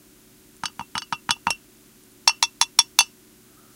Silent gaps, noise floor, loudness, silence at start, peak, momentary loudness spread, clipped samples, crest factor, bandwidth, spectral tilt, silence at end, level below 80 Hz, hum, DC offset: none; -53 dBFS; -21 LUFS; 0.65 s; 0 dBFS; 16 LU; under 0.1%; 26 dB; 17 kHz; 1.5 dB/octave; 0.7 s; -62 dBFS; none; under 0.1%